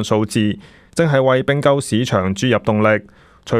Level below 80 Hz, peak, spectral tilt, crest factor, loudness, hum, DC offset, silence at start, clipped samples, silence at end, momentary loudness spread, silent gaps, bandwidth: -50 dBFS; -2 dBFS; -6 dB/octave; 16 dB; -17 LUFS; none; under 0.1%; 0 s; under 0.1%; 0 s; 6 LU; none; 15 kHz